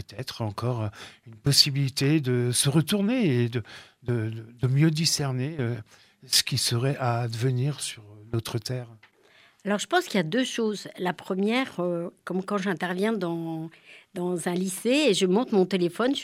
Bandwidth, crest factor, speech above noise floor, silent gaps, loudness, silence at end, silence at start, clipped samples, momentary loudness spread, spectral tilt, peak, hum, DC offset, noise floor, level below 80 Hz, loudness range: 16 kHz; 22 dB; 33 dB; none; -26 LUFS; 0 s; 0 s; under 0.1%; 13 LU; -4.5 dB/octave; -4 dBFS; none; under 0.1%; -59 dBFS; -64 dBFS; 5 LU